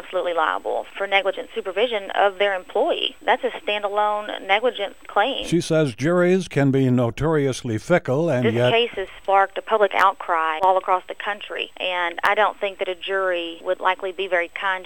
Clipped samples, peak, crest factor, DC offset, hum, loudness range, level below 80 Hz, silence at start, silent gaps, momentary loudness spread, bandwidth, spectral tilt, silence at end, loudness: under 0.1%; -2 dBFS; 18 dB; 0.5%; none; 3 LU; -52 dBFS; 0.05 s; none; 8 LU; 17.5 kHz; -5.5 dB/octave; 0 s; -21 LUFS